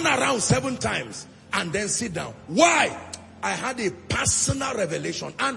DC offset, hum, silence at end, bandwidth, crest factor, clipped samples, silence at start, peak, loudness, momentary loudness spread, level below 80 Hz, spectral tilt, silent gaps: under 0.1%; none; 0 s; 11.5 kHz; 20 dB; under 0.1%; 0 s; -4 dBFS; -24 LUFS; 12 LU; -50 dBFS; -3 dB/octave; none